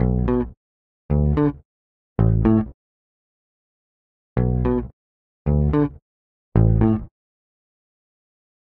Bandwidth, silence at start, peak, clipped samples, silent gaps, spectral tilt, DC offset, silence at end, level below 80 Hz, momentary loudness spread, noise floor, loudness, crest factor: 4 kHz; 0 s; -4 dBFS; under 0.1%; 0.57-1.09 s, 1.65-2.16 s, 2.74-4.36 s, 4.93-5.45 s, 6.02-6.52 s; -12.5 dB/octave; under 0.1%; 1.65 s; -30 dBFS; 13 LU; under -90 dBFS; -21 LUFS; 18 dB